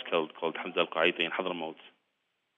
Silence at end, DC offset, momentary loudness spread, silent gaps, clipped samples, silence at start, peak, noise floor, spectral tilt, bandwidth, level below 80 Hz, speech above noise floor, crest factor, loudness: 0.7 s; under 0.1%; 10 LU; none; under 0.1%; 0 s; -12 dBFS; -79 dBFS; -6 dB/octave; 6.8 kHz; -82 dBFS; 48 dB; 22 dB; -31 LUFS